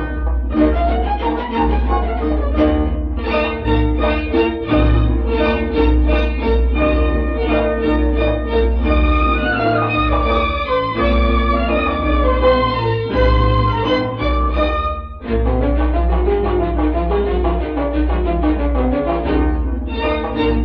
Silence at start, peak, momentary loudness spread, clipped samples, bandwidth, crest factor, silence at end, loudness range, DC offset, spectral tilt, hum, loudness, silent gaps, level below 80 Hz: 0 s; -2 dBFS; 4 LU; under 0.1%; 5.2 kHz; 14 dB; 0 s; 2 LU; under 0.1%; -9.5 dB/octave; none; -17 LUFS; none; -18 dBFS